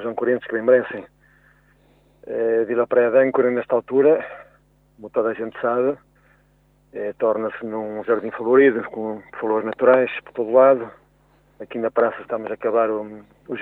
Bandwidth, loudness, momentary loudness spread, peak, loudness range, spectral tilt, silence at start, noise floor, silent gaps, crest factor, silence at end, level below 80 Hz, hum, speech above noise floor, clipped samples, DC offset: 4 kHz; -20 LUFS; 15 LU; -4 dBFS; 6 LU; -9 dB/octave; 0 s; -59 dBFS; none; 18 dB; 0 s; -64 dBFS; 50 Hz at -60 dBFS; 39 dB; under 0.1%; under 0.1%